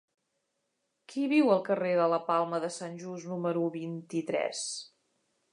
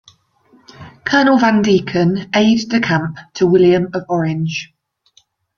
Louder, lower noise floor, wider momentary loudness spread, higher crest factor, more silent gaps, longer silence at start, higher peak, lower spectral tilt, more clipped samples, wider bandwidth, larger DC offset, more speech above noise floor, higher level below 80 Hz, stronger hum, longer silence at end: second, -30 LUFS vs -15 LUFS; first, -80 dBFS vs -56 dBFS; first, 13 LU vs 10 LU; first, 20 dB vs 14 dB; neither; first, 1.1 s vs 0.8 s; second, -12 dBFS vs -2 dBFS; about the same, -5 dB/octave vs -6 dB/octave; neither; first, 11 kHz vs 7.2 kHz; neither; first, 50 dB vs 42 dB; second, -86 dBFS vs -52 dBFS; neither; second, 0.65 s vs 0.9 s